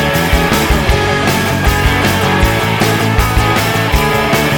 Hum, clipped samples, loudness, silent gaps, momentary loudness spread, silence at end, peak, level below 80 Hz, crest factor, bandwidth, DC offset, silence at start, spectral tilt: none; under 0.1%; -12 LUFS; none; 1 LU; 0 s; 0 dBFS; -20 dBFS; 12 dB; over 20 kHz; 0.2%; 0 s; -4.5 dB/octave